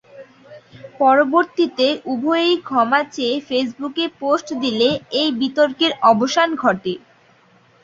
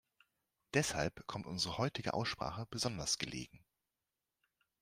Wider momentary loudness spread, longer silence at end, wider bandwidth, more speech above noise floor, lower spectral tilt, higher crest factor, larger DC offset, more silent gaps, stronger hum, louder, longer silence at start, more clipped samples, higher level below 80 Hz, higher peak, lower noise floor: about the same, 8 LU vs 8 LU; second, 0.85 s vs 1.25 s; second, 7.8 kHz vs 15.5 kHz; second, 36 dB vs over 51 dB; about the same, -4 dB/octave vs -3.5 dB/octave; second, 16 dB vs 24 dB; neither; neither; neither; first, -18 LUFS vs -38 LUFS; second, 0.15 s vs 0.75 s; neither; about the same, -62 dBFS vs -64 dBFS; first, -2 dBFS vs -18 dBFS; second, -53 dBFS vs under -90 dBFS